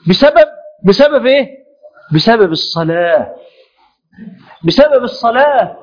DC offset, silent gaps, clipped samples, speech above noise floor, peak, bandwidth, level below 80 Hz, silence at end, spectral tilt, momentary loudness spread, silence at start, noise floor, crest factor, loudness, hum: under 0.1%; none; 0.4%; 44 dB; 0 dBFS; 5.4 kHz; -44 dBFS; 0.1 s; -6.5 dB/octave; 7 LU; 0.05 s; -54 dBFS; 12 dB; -11 LUFS; none